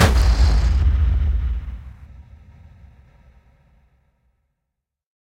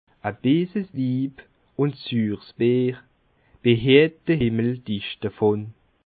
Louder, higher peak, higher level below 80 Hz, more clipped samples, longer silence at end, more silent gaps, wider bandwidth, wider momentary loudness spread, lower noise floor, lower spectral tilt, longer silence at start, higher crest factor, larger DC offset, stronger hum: first, -19 LUFS vs -23 LUFS; about the same, -2 dBFS vs -4 dBFS; first, -22 dBFS vs -54 dBFS; neither; first, 3 s vs 0.4 s; neither; first, 13.5 kHz vs 4.8 kHz; first, 19 LU vs 13 LU; first, -80 dBFS vs -60 dBFS; second, -5.5 dB/octave vs -11.5 dB/octave; second, 0 s vs 0.25 s; about the same, 20 dB vs 20 dB; neither; neither